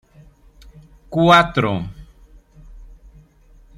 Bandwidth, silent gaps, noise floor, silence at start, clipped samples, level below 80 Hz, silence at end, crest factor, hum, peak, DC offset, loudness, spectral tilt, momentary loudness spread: 15 kHz; none; -49 dBFS; 1.1 s; under 0.1%; -44 dBFS; 0.9 s; 20 dB; none; 0 dBFS; under 0.1%; -16 LUFS; -6 dB/octave; 15 LU